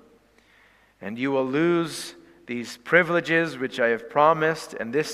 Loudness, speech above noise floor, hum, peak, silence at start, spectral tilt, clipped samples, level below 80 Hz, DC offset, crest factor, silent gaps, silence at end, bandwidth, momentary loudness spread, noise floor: -23 LUFS; 35 dB; none; -4 dBFS; 1 s; -5 dB/octave; under 0.1%; -68 dBFS; under 0.1%; 20 dB; none; 0 s; 15 kHz; 15 LU; -58 dBFS